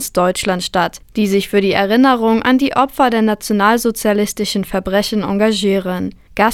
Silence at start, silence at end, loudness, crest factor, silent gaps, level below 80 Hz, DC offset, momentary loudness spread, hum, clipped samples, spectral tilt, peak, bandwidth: 0 s; 0 s; -15 LUFS; 14 dB; none; -42 dBFS; under 0.1%; 7 LU; none; under 0.1%; -4.5 dB/octave; 0 dBFS; 18 kHz